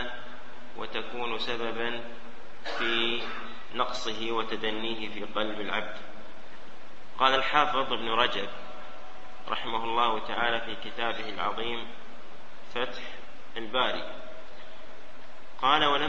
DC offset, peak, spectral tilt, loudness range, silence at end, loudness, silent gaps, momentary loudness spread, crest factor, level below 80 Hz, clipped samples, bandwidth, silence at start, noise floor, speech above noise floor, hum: 3%; -6 dBFS; -3.5 dB/octave; 6 LU; 0 s; -30 LUFS; none; 23 LU; 26 dB; -60 dBFS; under 0.1%; 8.4 kHz; 0 s; -50 dBFS; 21 dB; none